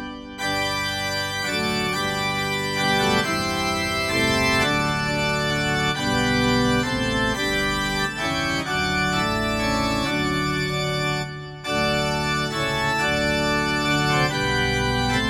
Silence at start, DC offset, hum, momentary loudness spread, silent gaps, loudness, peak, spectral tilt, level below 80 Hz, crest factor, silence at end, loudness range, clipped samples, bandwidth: 0 s; under 0.1%; none; 4 LU; none; -22 LUFS; -6 dBFS; -4 dB/octave; -40 dBFS; 16 dB; 0 s; 2 LU; under 0.1%; 17 kHz